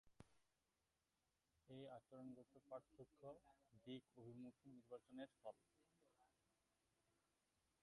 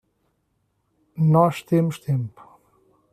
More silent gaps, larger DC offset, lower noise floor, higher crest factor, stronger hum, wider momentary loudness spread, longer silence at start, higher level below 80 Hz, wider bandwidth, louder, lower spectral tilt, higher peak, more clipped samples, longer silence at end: neither; neither; first, under -90 dBFS vs -71 dBFS; about the same, 20 dB vs 20 dB; neither; second, 7 LU vs 14 LU; second, 0.05 s vs 1.15 s; second, under -90 dBFS vs -64 dBFS; second, 11 kHz vs 14 kHz; second, -62 LUFS vs -21 LUFS; second, -6.5 dB/octave vs -8.5 dB/octave; second, -44 dBFS vs -4 dBFS; neither; first, 1.55 s vs 0.85 s